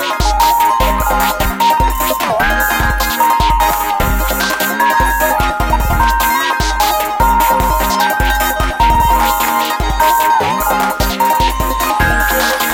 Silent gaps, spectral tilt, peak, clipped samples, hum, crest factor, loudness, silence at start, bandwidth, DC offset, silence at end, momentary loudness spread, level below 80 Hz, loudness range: none; -3.5 dB/octave; 0 dBFS; under 0.1%; none; 12 dB; -13 LUFS; 0 s; 17.5 kHz; under 0.1%; 0 s; 3 LU; -20 dBFS; 1 LU